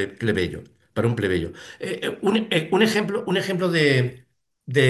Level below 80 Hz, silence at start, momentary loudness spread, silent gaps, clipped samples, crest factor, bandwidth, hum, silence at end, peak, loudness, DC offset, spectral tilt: -48 dBFS; 0 s; 12 LU; none; under 0.1%; 16 dB; 12.5 kHz; none; 0 s; -6 dBFS; -23 LUFS; under 0.1%; -5.5 dB/octave